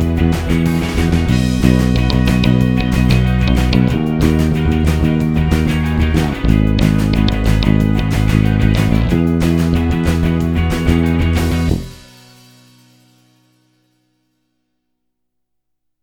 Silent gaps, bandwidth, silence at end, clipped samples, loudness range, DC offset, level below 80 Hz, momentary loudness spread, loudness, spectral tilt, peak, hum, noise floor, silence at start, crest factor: none; 18 kHz; 4.05 s; under 0.1%; 5 LU; under 0.1%; -22 dBFS; 3 LU; -14 LUFS; -7 dB/octave; 0 dBFS; none; -70 dBFS; 0 s; 14 dB